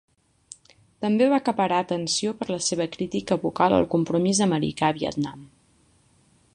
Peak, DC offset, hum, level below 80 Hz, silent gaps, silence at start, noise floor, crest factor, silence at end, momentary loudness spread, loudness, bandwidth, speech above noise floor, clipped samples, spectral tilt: -6 dBFS; under 0.1%; none; -56 dBFS; none; 1 s; -61 dBFS; 20 dB; 1.1 s; 8 LU; -24 LUFS; 11 kHz; 38 dB; under 0.1%; -4.5 dB/octave